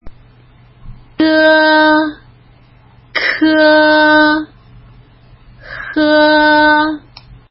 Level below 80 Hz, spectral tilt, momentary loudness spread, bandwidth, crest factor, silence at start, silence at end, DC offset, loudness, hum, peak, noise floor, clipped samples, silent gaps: -44 dBFS; -7 dB/octave; 13 LU; 5.8 kHz; 12 dB; 0.05 s; 0.5 s; under 0.1%; -10 LUFS; none; 0 dBFS; -44 dBFS; under 0.1%; none